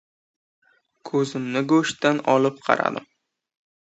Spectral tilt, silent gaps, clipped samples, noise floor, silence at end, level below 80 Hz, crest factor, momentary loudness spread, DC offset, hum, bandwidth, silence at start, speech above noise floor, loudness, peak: -5 dB/octave; none; under 0.1%; -44 dBFS; 0.9 s; -72 dBFS; 24 dB; 7 LU; under 0.1%; none; 8.2 kHz; 1.05 s; 23 dB; -22 LUFS; 0 dBFS